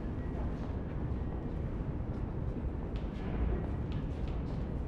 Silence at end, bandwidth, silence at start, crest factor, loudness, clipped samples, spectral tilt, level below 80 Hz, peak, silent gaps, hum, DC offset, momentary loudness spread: 0 s; 6 kHz; 0 s; 14 dB; -38 LUFS; under 0.1%; -9.5 dB/octave; -38 dBFS; -22 dBFS; none; none; under 0.1%; 3 LU